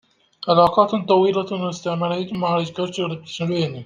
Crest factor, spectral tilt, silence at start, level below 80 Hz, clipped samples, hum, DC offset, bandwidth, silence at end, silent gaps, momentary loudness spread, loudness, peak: 18 dB; -6.5 dB/octave; 0.4 s; -58 dBFS; under 0.1%; none; under 0.1%; 9.6 kHz; 0 s; none; 10 LU; -20 LUFS; -2 dBFS